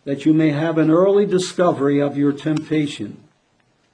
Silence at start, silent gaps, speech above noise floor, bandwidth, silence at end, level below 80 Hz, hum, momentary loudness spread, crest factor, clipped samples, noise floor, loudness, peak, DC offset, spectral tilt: 0.05 s; none; 44 dB; 10 kHz; 0.8 s; -64 dBFS; none; 8 LU; 14 dB; under 0.1%; -62 dBFS; -18 LUFS; -4 dBFS; under 0.1%; -6.5 dB/octave